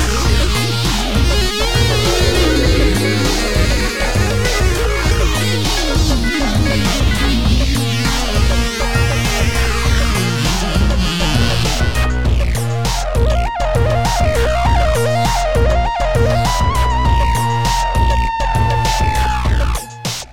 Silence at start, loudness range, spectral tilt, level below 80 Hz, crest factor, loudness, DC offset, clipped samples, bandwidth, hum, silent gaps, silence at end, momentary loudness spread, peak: 0 s; 2 LU; -4.5 dB/octave; -18 dBFS; 14 dB; -15 LUFS; 3%; under 0.1%; 17 kHz; none; none; 0 s; 3 LU; 0 dBFS